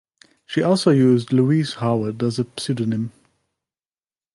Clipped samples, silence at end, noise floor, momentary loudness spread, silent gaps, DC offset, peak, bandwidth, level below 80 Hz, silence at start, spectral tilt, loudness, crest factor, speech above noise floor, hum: under 0.1%; 1.25 s; under -90 dBFS; 10 LU; none; under 0.1%; -4 dBFS; 11.5 kHz; -62 dBFS; 0.5 s; -7 dB/octave; -20 LUFS; 16 dB; over 71 dB; none